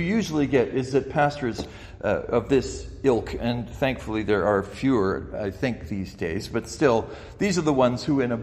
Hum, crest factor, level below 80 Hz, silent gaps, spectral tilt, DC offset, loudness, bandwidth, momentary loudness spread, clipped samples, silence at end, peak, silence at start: none; 18 dB; -44 dBFS; none; -6 dB/octave; under 0.1%; -25 LUFS; 14.5 kHz; 9 LU; under 0.1%; 0 s; -6 dBFS; 0 s